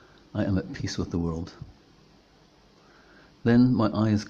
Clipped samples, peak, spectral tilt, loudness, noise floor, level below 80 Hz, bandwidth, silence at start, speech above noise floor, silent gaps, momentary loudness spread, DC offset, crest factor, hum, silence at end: under 0.1%; -10 dBFS; -7.5 dB/octave; -26 LUFS; -58 dBFS; -52 dBFS; 7.6 kHz; 0.35 s; 33 dB; none; 19 LU; under 0.1%; 18 dB; none; 0 s